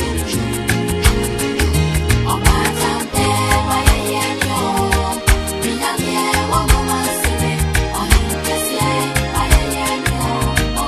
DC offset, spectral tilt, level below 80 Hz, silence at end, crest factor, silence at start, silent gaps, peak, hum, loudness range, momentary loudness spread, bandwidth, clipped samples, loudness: under 0.1%; -4 dB/octave; -22 dBFS; 0 s; 16 dB; 0 s; none; 0 dBFS; none; 1 LU; 4 LU; 13.5 kHz; under 0.1%; -16 LUFS